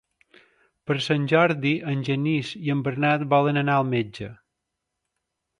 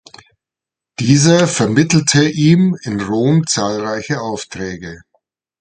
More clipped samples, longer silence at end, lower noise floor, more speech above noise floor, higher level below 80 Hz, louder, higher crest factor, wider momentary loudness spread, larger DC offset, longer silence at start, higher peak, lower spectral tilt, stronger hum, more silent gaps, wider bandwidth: neither; first, 1.25 s vs 0.65 s; second, -82 dBFS vs -86 dBFS; second, 59 dB vs 72 dB; second, -64 dBFS vs -48 dBFS; second, -23 LUFS vs -14 LUFS; about the same, 20 dB vs 16 dB; second, 10 LU vs 14 LU; neither; second, 0.85 s vs 1 s; second, -6 dBFS vs 0 dBFS; first, -7 dB/octave vs -5 dB/octave; neither; neither; first, 10.5 kHz vs 9.4 kHz